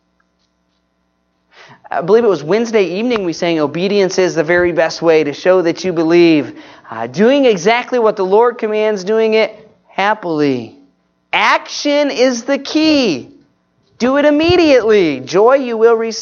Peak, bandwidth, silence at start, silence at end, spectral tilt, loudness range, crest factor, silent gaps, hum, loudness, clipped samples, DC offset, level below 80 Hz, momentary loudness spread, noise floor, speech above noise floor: 0 dBFS; 7.2 kHz; 1.9 s; 0 s; -5 dB/octave; 3 LU; 14 dB; none; none; -13 LUFS; under 0.1%; under 0.1%; -52 dBFS; 8 LU; -63 dBFS; 50 dB